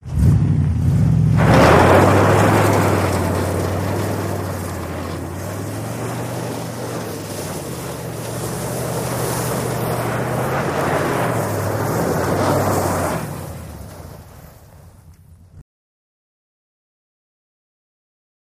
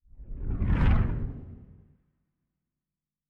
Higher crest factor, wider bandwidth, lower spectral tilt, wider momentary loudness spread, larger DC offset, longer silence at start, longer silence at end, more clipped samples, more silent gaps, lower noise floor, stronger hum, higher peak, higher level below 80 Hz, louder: about the same, 20 dB vs 18 dB; first, 15.5 kHz vs 4.5 kHz; second, -6 dB/octave vs -9.5 dB/octave; second, 14 LU vs 22 LU; neither; about the same, 0.05 s vs 0.15 s; first, 2.95 s vs 1.65 s; neither; neither; second, -45 dBFS vs under -90 dBFS; neither; first, 0 dBFS vs -12 dBFS; about the same, -34 dBFS vs -32 dBFS; first, -19 LUFS vs -29 LUFS